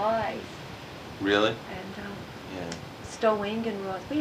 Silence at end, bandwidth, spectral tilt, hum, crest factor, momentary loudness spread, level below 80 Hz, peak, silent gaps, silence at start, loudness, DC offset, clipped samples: 0 s; 15.5 kHz; -5 dB/octave; none; 22 dB; 16 LU; -56 dBFS; -8 dBFS; none; 0 s; -30 LUFS; under 0.1%; under 0.1%